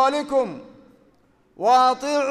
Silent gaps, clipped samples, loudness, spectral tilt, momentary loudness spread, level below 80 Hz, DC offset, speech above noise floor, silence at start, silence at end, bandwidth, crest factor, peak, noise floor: none; under 0.1%; -20 LUFS; -3.5 dB/octave; 12 LU; -64 dBFS; under 0.1%; 39 dB; 0 s; 0 s; 12 kHz; 16 dB; -6 dBFS; -59 dBFS